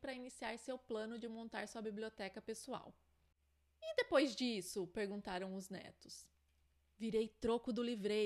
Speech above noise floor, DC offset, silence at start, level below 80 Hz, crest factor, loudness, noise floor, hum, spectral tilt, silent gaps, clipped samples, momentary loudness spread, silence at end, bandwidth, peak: 35 dB; under 0.1%; 0 s; -72 dBFS; 22 dB; -43 LUFS; -77 dBFS; none; -4.5 dB/octave; none; under 0.1%; 15 LU; 0 s; 13.5 kHz; -22 dBFS